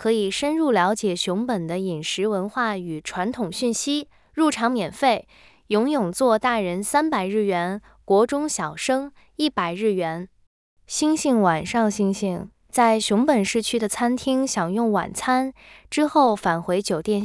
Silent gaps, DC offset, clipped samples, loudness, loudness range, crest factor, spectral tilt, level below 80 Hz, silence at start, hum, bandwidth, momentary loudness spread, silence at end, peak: 10.47-10.77 s; under 0.1%; under 0.1%; -22 LUFS; 3 LU; 16 dB; -4.5 dB/octave; -58 dBFS; 0 s; none; 12 kHz; 8 LU; 0 s; -6 dBFS